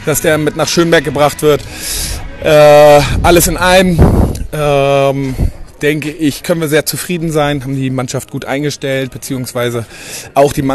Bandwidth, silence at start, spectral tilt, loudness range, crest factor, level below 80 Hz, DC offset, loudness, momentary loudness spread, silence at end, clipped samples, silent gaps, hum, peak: 13 kHz; 0 s; -5 dB/octave; 8 LU; 12 dB; -24 dBFS; under 0.1%; -11 LUFS; 12 LU; 0 s; 0.3%; none; none; 0 dBFS